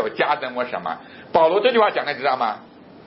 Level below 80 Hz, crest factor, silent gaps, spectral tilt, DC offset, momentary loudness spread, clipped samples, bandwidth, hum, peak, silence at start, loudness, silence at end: -64 dBFS; 18 dB; none; -8.5 dB/octave; under 0.1%; 13 LU; under 0.1%; 5.8 kHz; none; -2 dBFS; 0 s; -20 LUFS; 0.1 s